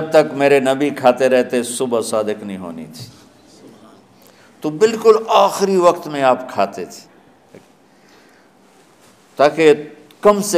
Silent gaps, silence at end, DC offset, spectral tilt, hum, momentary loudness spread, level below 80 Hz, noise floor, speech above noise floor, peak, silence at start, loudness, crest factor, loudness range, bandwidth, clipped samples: none; 0 s; under 0.1%; -4.5 dB/octave; none; 18 LU; -62 dBFS; -50 dBFS; 35 dB; 0 dBFS; 0 s; -15 LUFS; 18 dB; 8 LU; 15.5 kHz; under 0.1%